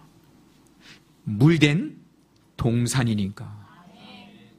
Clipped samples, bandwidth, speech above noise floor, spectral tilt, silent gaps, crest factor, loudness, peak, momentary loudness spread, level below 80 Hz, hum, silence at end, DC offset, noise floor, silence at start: under 0.1%; 15 kHz; 38 dB; -6 dB/octave; none; 24 dB; -22 LUFS; -2 dBFS; 27 LU; -52 dBFS; none; 0.4 s; under 0.1%; -59 dBFS; 0.9 s